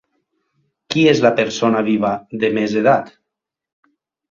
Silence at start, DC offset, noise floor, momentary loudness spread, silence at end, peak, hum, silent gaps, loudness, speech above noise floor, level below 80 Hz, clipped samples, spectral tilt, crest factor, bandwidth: 0.9 s; under 0.1%; -82 dBFS; 8 LU; 1.2 s; 0 dBFS; none; none; -16 LUFS; 66 dB; -58 dBFS; under 0.1%; -5.5 dB/octave; 18 dB; 7.4 kHz